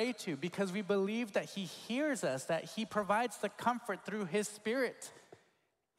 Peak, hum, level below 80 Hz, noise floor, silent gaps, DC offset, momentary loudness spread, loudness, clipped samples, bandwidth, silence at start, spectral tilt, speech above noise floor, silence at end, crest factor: -18 dBFS; none; -82 dBFS; -79 dBFS; none; under 0.1%; 6 LU; -37 LUFS; under 0.1%; 16 kHz; 0 s; -4.5 dB/octave; 42 dB; 0.65 s; 18 dB